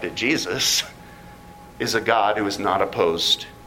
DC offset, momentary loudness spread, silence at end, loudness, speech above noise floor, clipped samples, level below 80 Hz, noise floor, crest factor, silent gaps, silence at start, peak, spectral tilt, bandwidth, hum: under 0.1%; 4 LU; 0 s; -21 LUFS; 21 dB; under 0.1%; -52 dBFS; -43 dBFS; 20 dB; none; 0 s; -2 dBFS; -2 dB/octave; 16.5 kHz; none